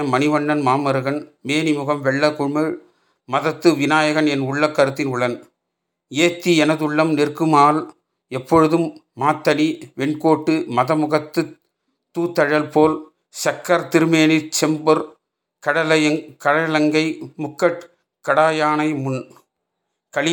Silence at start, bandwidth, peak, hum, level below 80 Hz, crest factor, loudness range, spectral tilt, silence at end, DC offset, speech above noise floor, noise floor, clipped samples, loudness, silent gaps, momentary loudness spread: 0 s; 20 kHz; -2 dBFS; none; -66 dBFS; 18 dB; 3 LU; -5 dB/octave; 0 s; under 0.1%; 60 dB; -78 dBFS; under 0.1%; -18 LUFS; none; 11 LU